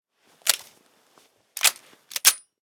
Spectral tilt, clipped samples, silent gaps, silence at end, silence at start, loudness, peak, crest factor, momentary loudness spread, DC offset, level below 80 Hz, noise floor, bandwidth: 4 dB/octave; under 0.1%; none; 0.25 s; 0.45 s; -22 LUFS; 0 dBFS; 28 dB; 13 LU; under 0.1%; -82 dBFS; -61 dBFS; 16 kHz